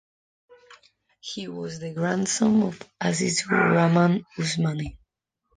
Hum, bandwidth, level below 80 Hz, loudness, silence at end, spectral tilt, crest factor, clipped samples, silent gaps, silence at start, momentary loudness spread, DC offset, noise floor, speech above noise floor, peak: none; 10 kHz; -56 dBFS; -24 LUFS; 0.6 s; -5 dB/octave; 18 dB; under 0.1%; none; 0.7 s; 14 LU; under 0.1%; -76 dBFS; 52 dB; -6 dBFS